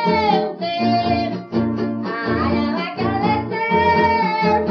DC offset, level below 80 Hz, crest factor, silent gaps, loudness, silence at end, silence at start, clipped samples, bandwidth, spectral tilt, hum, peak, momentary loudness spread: under 0.1%; -44 dBFS; 14 dB; none; -19 LUFS; 0 s; 0 s; under 0.1%; 6.4 kHz; -7.5 dB/octave; none; -4 dBFS; 7 LU